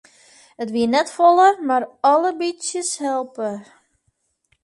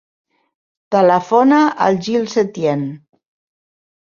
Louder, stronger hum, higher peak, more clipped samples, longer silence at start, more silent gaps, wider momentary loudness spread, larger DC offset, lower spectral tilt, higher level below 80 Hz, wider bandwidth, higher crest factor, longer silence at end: second, -19 LUFS vs -15 LUFS; neither; about the same, -2 dBFS vs -2 dBFS; neither; second, 0.6 s vs 0.9 s; neither; first, 14 LU vs 7 LU; neither; second, -3 dB/octave vs -6 dB/octave; second, -68 dBFS vs -62 dBFS; first, 11.5 kHz vs 7.2 kHz; about the same, 18 dB vs 16 dB; second, 1 s vs 1.2 s